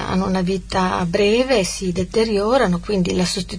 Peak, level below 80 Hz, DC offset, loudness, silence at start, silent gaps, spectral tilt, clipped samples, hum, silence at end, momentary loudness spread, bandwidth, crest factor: -4 dBFS; -36 dBFS; 0.1%; -19 LUFS; 0 s; none; -5 dB/octave; under 0.1%; none; 0 s; 4 LU; 11 kHz; 16 dB